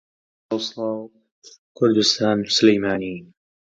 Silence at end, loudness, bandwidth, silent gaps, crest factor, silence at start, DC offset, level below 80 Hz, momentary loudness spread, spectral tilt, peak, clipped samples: 0.55 s; -20 LUFS; 9.2 kHz; 1.32-1.42 s, 1.58-1.75 s; 20 dB; 0.5 s; under 0.1%; -60 dBFS; 14 LU; -4 dB/octave; -2 dBFS; under 0.1%